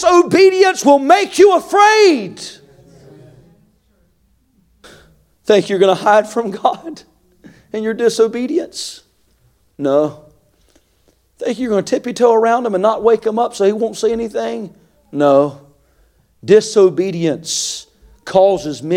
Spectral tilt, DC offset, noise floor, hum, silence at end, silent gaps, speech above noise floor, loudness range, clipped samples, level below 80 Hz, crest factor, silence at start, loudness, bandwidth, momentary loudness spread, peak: -4 dB/octave; under 0.1%; -58 dBFS; none; 0 s; none; 44 dB; 8 LU; under 0.1%; -56 dBFS; 16 dB; 0 s; -14 LUFS; 14.5 kHz; 18 LU; 0 dBFS